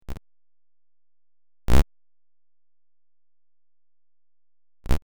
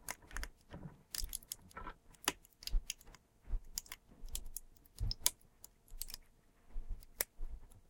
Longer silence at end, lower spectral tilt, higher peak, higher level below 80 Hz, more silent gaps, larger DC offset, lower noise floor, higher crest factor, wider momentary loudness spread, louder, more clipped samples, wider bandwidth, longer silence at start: about the same, 0 s vs 0.05 s; first, -6 dB/octave vs -1.5 dB/octave; about the same, -6 dBFS vs -6 dBFS; first, -32 dBFS vs -48 dBFS; neither; neither; first, under -90 dBFS vs -65 dBFS; second, 16 dB vs 38 dB; about the same, 20 LU vs 18 LU; first, -26 LUFS vs -44 LUFS; neither; first, over 20 kHz vs 17 kHz; about the same, 0 s vs 0 s